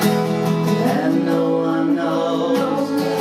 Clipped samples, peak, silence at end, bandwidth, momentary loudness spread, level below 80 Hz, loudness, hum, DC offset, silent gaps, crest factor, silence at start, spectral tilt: under 0.1%; -4 dBFS; 0 s; 16 kHz; 2 LU; -62 dBFS; -19 LUFS; none; under 0.1%; none; 14 dB; 0 s; -6.5 dB/octave